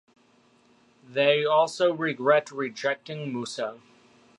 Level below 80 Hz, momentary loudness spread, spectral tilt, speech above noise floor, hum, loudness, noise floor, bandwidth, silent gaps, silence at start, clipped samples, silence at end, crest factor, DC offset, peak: -80 dBFS; 12 LU; -4.5 dB/octave; 36 dB; none; -26 LUFS; -62 dBFS; 11.5 kHz; none; 1.1 s; under 0.1%; 0.6 s; 20 dB; under 0.1%; -8 dBFS